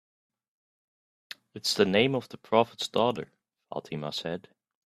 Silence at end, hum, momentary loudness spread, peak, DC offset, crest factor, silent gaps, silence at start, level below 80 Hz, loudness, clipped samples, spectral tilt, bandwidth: 0.45 s; none; 20 LU; -6 dBFS; under 0.1%; 24 dB; none; 1.55 s; -70 dBFS; -28 LUFS; under 0.1%; -4.5 dB/octave; 14.5 kHz